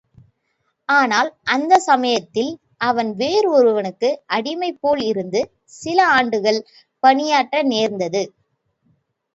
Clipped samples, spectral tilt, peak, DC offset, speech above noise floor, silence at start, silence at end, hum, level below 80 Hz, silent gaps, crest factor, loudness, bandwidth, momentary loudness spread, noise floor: under 0.1%; -3.5 dB/octave; 0 dBFS; under 0.1%; 52 dB; 0.9 s; 1.1 s; none; -64 dBFS; none; 18 dB; -18 LUFS; 8 kHz; 10 LU; -70 dBFS